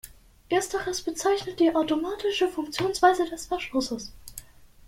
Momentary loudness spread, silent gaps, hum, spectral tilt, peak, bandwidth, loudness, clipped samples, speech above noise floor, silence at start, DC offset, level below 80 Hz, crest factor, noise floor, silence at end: 14 LU; none; none; -3.5 dB/octave; -6 dBFS; 16.5 kHz; -26 LUFS; under 0.1%; 21 dB; 0.05 s; under 0.1%; -54 dBFS; 20 dB; -47 dBFS; 0.2 s